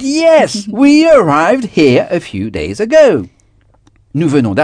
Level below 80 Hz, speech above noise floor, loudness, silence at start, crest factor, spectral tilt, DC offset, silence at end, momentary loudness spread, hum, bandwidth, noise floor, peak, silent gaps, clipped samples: -42 dBFS; 40 dB; -10 LUFS; 0 s; 10 dB; -5.5 dB/octave; under 0.1%; 0 s; 11 LU; none; 10 kHz; -50 dBFS; 0 dBFS; none; 0.7%